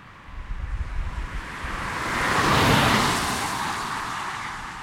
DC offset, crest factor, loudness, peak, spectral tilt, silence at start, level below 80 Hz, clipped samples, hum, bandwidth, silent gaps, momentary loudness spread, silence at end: under 0.1%; 20 dB; -24 LUFS; -6 dBFS; -3.5 dB/octave; 0 s; -36 dBFS; under 0.1%; none; 16.5 kHz; none; 16 LU; 0 s